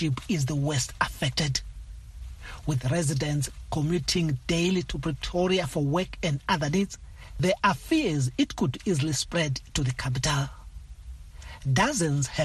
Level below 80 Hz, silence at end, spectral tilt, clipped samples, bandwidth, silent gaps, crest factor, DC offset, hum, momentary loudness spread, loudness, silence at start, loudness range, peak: -42 dBFS; 0 s; -5 dB/octave; under 0.1%; 12.5 kHz; none; 18 dB; under 0.1%; none; 19 LU; -27 LUFS; 0 s; 2 LU; -8 dBFS